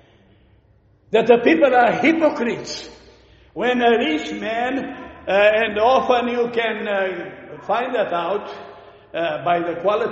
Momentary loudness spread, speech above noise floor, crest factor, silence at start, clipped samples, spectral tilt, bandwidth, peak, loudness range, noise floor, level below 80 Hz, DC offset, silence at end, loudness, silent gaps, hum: 17 LU; 37 dB; 20 dB; 1.1 s; under 0.1%; -2.5 dB/octave; 8 kHz; 0 dBFS; 5 LU; -55 dBFS; -56 dBFS; under 0.1%; 0 s; -19 LUFS; none; none